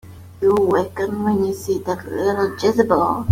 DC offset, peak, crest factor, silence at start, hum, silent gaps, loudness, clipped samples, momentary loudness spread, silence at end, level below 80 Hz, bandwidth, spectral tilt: under 0.1%; -2 dBFS; 16 dB; 0.05 s; none; none; -19 LUFS; under 0.1%; 7 LU; 0 s; -50 dBFS; 16 kHz; -6.5 dB/octave